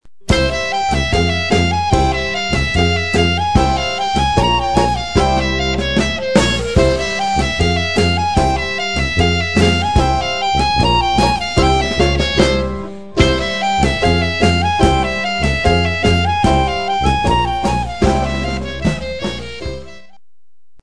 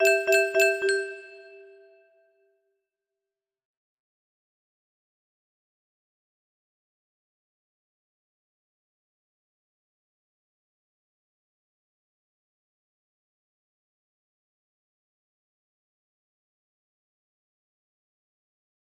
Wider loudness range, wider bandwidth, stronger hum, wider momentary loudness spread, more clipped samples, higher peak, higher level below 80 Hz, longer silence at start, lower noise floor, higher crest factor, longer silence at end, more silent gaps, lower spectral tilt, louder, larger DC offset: second, 2 LU vs 18 LU; second, 11 kHz vs 13.5 kHz; neither; second, 5 LU vs 16 LU; neither; first, 0 dBFS vs -10 dBFS; first, -24 dBFS vs -84 dBFS; about the same, 0 s vs 0 s; second, -82 dBFS vs -90 dBFS; second, 16 dB vs 26 dB; second, 0 s vs 17.45 s; neither; first, -5 dB/octave vs -0.5 dB/octave; first, -15 LUFS vs -22 LUFS; first, 2% vs under 0.1%